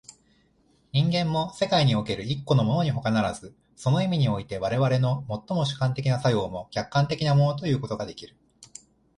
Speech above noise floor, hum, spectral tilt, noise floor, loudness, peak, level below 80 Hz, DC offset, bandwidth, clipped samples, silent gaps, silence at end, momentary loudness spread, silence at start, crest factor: 39 dB; none; -6.5 dB/octave; -64 dBFS; -25 LUFS; -10 dBFS; -54 dBFS; under 0.1%; 11 kHz; under 0.1%; none; 0.5 s; 10 LU; 0.95 s; 16 dB